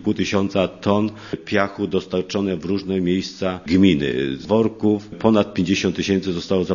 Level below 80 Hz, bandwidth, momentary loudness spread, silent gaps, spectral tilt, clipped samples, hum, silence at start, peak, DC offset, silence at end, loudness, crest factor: -50 dBFS; 7.4 kHz; 7 LU; none; -6 dB/octave; under 0.1%; none; 0 s; 0 dBFS; under 0.1%; 0 s; -20 LUFS; 20 dB